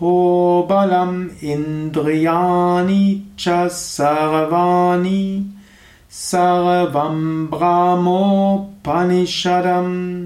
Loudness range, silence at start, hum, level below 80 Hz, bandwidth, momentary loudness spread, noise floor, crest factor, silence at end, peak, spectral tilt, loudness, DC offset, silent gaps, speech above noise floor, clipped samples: 2 LU; 0 s; none; -52 dBFS; 14 kHz; 7 LU; -46 dBFS; 12 dB; 0 s; -4 dBFS; -6 dB/octave; -16 LUFS; under 0.1%; none; 30 dB; under 0.1%